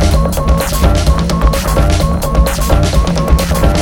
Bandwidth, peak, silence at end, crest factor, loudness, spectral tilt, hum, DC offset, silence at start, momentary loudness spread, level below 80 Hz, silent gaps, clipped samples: 17.5 kHz; 0 dBFS; 0 s; 10 dB; -13 LUFS; -5.5 dB/octave; none; under 0.1%; 0 s; 2 LU; -12 dBFS; none; under 0.1%